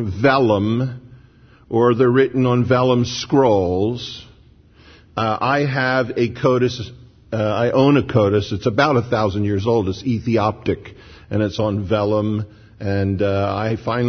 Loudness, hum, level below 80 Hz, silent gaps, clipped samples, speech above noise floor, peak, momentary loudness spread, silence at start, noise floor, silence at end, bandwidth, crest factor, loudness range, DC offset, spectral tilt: -18 LUFS; none; -48 dBFS; none; under 0.1%; 31 dB; 0 dBFS; 11 LU; 0 s; -49 dBFS; 0 s; 6.6 kHz; 18 dB; 4 LU; under 0.1%; -7 dB/octave